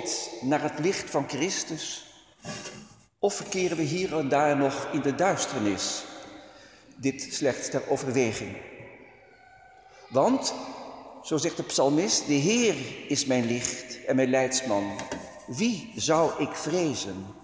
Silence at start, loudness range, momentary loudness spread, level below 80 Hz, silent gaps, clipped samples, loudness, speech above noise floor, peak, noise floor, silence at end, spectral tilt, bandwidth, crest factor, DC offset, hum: 0 s; 5 LU; 16 LU; -62 dBFS; none; under 0.1%; -27 LUFS; 27 dB; -10 dBFS; -54 dBFS; 0 s; -4 dB/octave; 8 kHz; 18 dB; under 0.1%; none